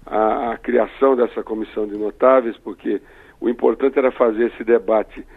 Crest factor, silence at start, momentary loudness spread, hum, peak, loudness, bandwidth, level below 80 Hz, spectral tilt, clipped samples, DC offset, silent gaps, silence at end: 18 dB; 0.05 s; 10 LU; none; 0 dBFS; -19 LUFS; 4.2 kHz; -48 dBFS; -8 dB/octave; under 0.1%; under 0.1%; none; 0.15 s